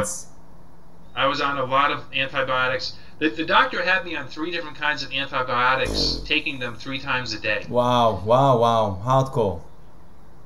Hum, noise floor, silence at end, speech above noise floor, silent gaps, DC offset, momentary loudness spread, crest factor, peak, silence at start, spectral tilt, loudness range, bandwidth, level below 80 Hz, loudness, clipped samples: none; -49 dBFS; 0.8 s; 27 dB; none; 2%; 10 LU; 20 dB; -4 dBFS; 0 s; -4.5 dB/octave; 3 LU; 13 kHz; -44 dBFS; -22 LUFS; under 0.1%